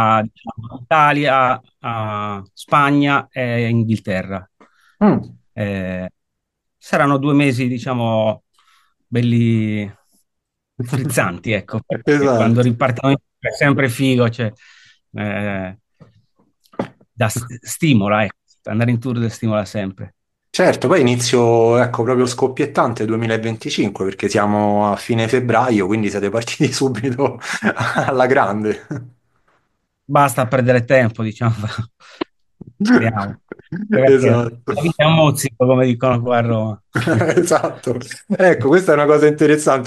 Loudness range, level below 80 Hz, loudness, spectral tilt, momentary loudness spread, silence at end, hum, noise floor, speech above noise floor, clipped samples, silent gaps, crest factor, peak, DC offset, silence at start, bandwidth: 5 LU; -56 dBFS; -17 LUFS; -6 dB/octave; 15 LU; 0 s; none; -76 dBFS; 60 dB; under 0.1%; none; 16 dB; 0 dBFS; under 0.1%; 0 s; 12.5 kHz